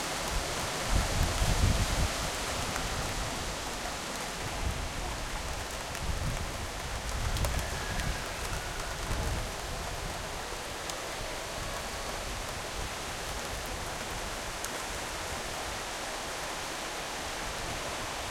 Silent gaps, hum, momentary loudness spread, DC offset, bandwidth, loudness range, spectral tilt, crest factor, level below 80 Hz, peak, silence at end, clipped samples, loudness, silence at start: none; none; 6 LU; under 0.1%; 17 kHz; 5 LU; -3 dB/octave; 20 dB; -40 dBFS; -14 dBFS; 0 s; under 0.1%; -34 LUFS; 0 s